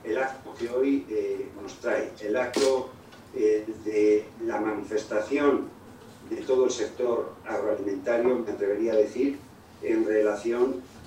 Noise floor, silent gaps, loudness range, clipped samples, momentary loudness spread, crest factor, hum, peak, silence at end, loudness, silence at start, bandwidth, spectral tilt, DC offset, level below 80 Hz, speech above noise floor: -47 dBFS; none; 2 LU; under 0.1%; 10 LU; 18 dB; none; -10 dBFS; 0 s; -27 LUFS; 0 s; 15.5 kHz; -4.5 dB/octave; under 0.1%; -66 dBFS; 21 dB